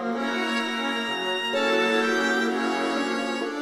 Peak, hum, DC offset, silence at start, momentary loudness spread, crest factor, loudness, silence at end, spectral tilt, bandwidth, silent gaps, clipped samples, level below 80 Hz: -10 dBFS; none; under 0.1%; 0 s; 5 LU; 16 dB; -24 LUFS; 0 s; -3 dB/octave; 15 kHz; none; under 0.1%; -74 dBFS